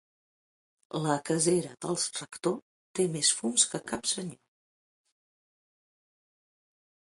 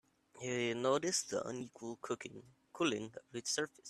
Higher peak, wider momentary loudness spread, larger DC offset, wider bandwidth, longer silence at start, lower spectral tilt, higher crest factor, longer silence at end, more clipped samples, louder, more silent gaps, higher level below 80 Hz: first, -6 dBFS vs -20 dBFS; about the same, 11 LU vs 13 LU; neither; second, 11.5 kHz vs 14 kHz; first, 0.95 s vs 0.35 s; about the same, -3 dB/octave vs -3 dB/octave; first, 26 dB vs 20 dB; first, 2.85 s vs 0 s; neither; first, -29 LUFS vs -38 LUFS; first, 2.62-2.94 s vs none; first, -72 dBFS vs -80 dBFS